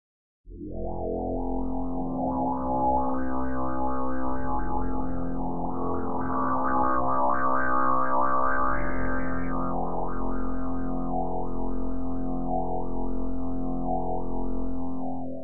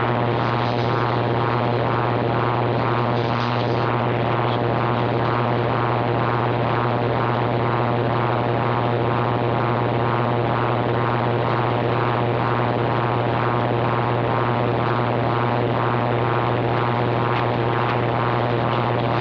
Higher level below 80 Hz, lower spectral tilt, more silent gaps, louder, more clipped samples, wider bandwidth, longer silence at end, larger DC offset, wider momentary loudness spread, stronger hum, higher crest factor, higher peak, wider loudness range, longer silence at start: first, -40 dBFS vs -46 dBFS; first, -14 dB/octave vs -9 dB/octave; neither; second, -29 LUFS vs -21 LUFS; neither; second, 2.5 kHz vs 5.4 kHz; about the same, 0 s vs 0 s; first, 5% vs under 0.1%; first, 8 LU vs 0 LU; neither; about the same, 14 dB vs 12 dB; about the same, -10 dBFS vs -8 dBFS; first, 6 LU vs 0 LU; first, 0.45 s vs 0 s